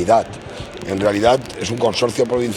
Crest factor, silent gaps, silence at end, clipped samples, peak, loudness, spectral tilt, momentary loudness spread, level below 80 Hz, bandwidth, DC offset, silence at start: 18 dB; none; 0 s; under 0.1%; 0 dBFS; -18 LUFS; -5 dB/octave; 14 LU; -46 dBFS; 15 kHz; under 0.1%; 0 s